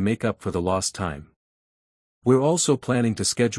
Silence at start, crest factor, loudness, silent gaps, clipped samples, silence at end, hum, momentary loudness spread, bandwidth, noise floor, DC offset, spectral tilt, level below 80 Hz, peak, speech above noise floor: 0 s; 18 dB; -23 LUFS; 1.36-2.22 s; under 0.1%; 0 s; none; 10 LU; 12 kHz; under -90 dBFS; under 0.1%; -4.5 dB/octave; -54 dBFS; -6 dBFS; over 68 dB